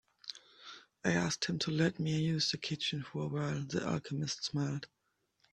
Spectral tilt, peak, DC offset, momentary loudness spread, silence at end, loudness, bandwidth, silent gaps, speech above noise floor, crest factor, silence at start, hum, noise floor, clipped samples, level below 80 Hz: -4.5 dB/octave; -16 dBFS; under 0.1%; 16 LU; 0.7 s; -35 LUFS; 10.5 kHz; none; 41 dB; 20 dB; 0.25 s; none; -76 dBFS; under 0.1%; -68 dBFS